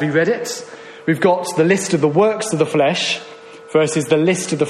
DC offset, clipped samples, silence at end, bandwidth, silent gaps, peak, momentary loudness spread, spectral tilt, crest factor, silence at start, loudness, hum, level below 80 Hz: under 0.1%; under 0.1%; 0 s; 13.5 kHz; none; -2 dBFS; 10 LU; -4.5 dB/octave; 14 dB; 0 s; -17 LUFS; none; -60 dBFS